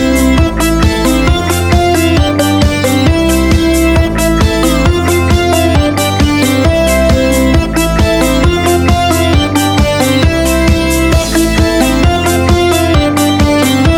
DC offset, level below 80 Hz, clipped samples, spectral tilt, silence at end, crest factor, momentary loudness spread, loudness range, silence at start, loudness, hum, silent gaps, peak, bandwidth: under 0.1%; -16 dBFS; under 0.1%; -5 dB/octave; 0 s; 8 dB; 1 LU; 0 LU; 0 s; -10 LUFS; none; none; 0 dBFS; 19 kHz